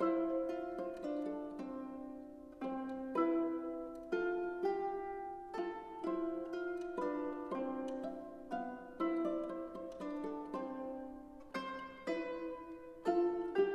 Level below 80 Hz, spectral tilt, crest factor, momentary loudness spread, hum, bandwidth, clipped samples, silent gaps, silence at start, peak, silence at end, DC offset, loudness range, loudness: -68 dBFS; -6.5 dB/octave; 18 dB; 11 LU; none; 9 kHz; under 0.1%; none; 0 s; -22 dBFS; 0 s; under 0.1%; 3 LU; -41 LUFS